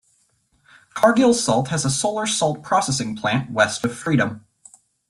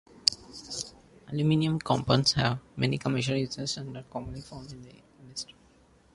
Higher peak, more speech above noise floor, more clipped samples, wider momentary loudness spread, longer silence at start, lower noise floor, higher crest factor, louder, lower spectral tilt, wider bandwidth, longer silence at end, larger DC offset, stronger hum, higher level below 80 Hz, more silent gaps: about the same, -2 dBFS vs -2 dBFS; first, 44 dB vs 32 dB; neither; second, 7 LU vs 18 LU; first, 0.95 s vs 0.15 s; first, -64 dBFS vs -60 dBFS; second, 18 dB vs 30 dB; first, -20 LUFS vs -29 LUFS; about the same, -4 dB/octave vs -5 dB/octave; first, 13.5 kHz vs 11.5 kHz; about the same, 0.7 s vs 0.7 s; neither; neither; about the same, -56 dBFS vs -56 dBFS; neither